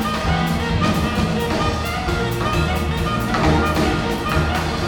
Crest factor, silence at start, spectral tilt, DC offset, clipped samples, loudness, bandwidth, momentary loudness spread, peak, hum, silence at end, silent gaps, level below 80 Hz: 14 dB; 0 s; -5.5 dB/octave; under 0.1%; under 0.1%; -20 LUFS; 19.5 kHz; 4 LU; -4 dBFS; none; 0 s; none; -28 dBFS